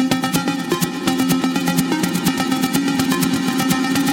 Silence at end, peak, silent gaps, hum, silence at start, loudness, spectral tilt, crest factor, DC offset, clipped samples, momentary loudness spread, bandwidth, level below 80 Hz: 0 s; -2 dBFS; none; none; 0 s; -18 LUFS; -4 dB/octave; 16 dB; under 0.1%; under 0.1%; 2 LU; 17 kHz; -50 dBFS